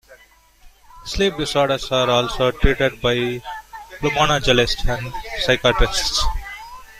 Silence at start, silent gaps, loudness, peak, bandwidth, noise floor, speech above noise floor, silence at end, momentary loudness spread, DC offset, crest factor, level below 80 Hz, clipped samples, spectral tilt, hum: 0.1 s; none; -19 LUFS; 0 dBFS; 15.5 kHz; -51 dBFS; 33 dB; 0 s; 15 LU; under 0.1%; 20 dB; -28 dBFS; under 0.1%; -4 dB/octave; none